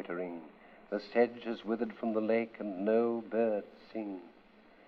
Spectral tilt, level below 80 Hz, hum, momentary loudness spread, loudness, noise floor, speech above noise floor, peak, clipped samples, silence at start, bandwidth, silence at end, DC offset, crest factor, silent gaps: -8.5 dB/octave; -76 dBFS; none; 13 LU; -34 LUFS; -60 dBFS; 27 dB; -14 dBFS; under 0.1%; 0 s; 5.8 kHz; 0.55 s; under 0.1%; 20 dB; none